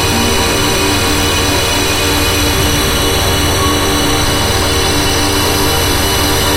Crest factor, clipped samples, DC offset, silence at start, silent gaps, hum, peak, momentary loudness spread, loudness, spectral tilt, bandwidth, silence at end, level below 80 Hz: 12 dB; under 0.1%; under 0.1%; 0 s; none; none; 0 dBFS; 0 LU; -11 LUFS; -3 dB/octave; 16 kHz; 0 s; -22 dBFS